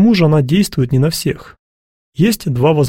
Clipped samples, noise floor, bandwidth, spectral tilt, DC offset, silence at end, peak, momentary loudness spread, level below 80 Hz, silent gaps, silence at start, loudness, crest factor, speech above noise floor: under 0.1%; under -90 dBFS; 16.5 kHz; -6.5 dB/octave; under 0.1%; 0 s; 0 dBFS; 10 LU; -42 dBFS; 1.59-2.12 s; 0 s; -14 LUFS; 12 dB; over 77 dB